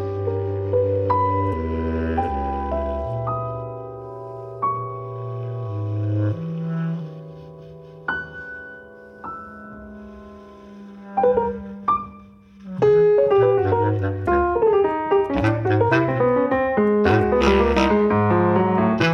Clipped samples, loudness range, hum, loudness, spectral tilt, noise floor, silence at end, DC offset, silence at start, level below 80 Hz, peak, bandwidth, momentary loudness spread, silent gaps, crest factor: under 0.1%; 13 LU; none; -21 LUFS; -8 dB/octave; -45 dBFS; 0 s; under 0.1%; 0 s; -38 dBFS; -4 dBFS; 7.2 kHz; 21 LU; none; 18 dB